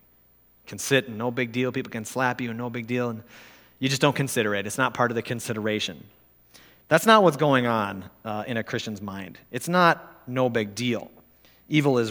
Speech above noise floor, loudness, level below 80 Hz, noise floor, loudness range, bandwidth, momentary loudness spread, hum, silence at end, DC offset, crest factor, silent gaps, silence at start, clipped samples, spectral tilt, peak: 35 dB; -25 LUFS; -66 dBFS; -59 dBFS; 5 LU; over 20 kHz; 13 LU; none; 0 s; under 0.1%; 24 dB; none; 0.65 s; under 0.1%; -5 dB/octave; -2 dBFS